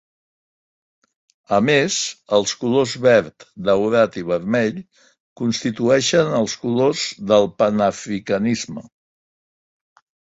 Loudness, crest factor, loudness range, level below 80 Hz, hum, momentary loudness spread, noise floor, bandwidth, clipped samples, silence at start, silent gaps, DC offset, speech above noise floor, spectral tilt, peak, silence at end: -19 LUFS; 18 dB; 2 LU; -58 dBFS; none; 9 LU; under -90 dBFS; 8 kHz; under 0.1%; 1.5 s; 5.20-5.36 s; under 0.1%; over 71 dB; -4.5 dB/octave; -2 dBFS; 1.45 s